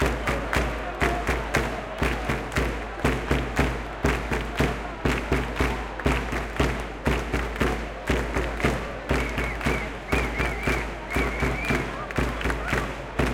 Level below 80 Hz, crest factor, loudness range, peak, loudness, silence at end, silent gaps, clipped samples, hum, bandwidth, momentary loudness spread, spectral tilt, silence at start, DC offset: -32 dBFS; 20 dB; 1 LU; -6 dBFS; -27 LUFS; 0 s; none; under 0.1%; none; 16.5 kHz; 3 LU; -5.5 dB/octave; 0 s; under 0.1%